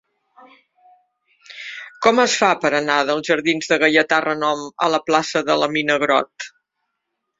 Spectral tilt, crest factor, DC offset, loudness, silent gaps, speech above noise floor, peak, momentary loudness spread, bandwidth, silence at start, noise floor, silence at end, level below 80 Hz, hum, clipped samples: -3 dB/octave; 20 dB; under 0.1%; -18 LUFS; none; 59 dB; 0 dBFS; 17 LU; 7.8 kHz; 1.5 s; -77 dBFS; 0.9 s; -64 dBFS; none; under 0.1%